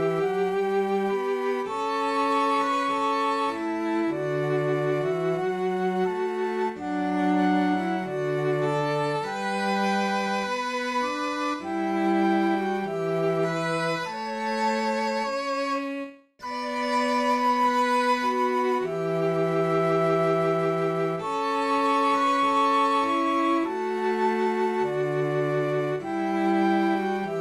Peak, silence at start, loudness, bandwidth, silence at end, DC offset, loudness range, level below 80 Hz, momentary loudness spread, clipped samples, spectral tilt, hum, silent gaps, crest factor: -12 dBFS; 0 s; -25 LUFS; 13 kHz; 0 s; under 0.1%; 3 LU; -70 dBFS; 6 LU; under 0.1%; -6 dB/octave; none; none; 12 dB